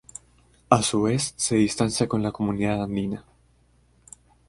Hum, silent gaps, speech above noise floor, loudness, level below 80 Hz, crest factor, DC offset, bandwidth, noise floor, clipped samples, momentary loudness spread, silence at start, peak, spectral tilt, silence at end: none; none; 37 dB; -24 LUFS; -52 dBFS; 24 dB; under 0.1%; 11.5 kHz; -61 dBFS; under 0.1%; 11 LU; 0.7 s; 0 dBFS; -5 dB/octave; 1.3 s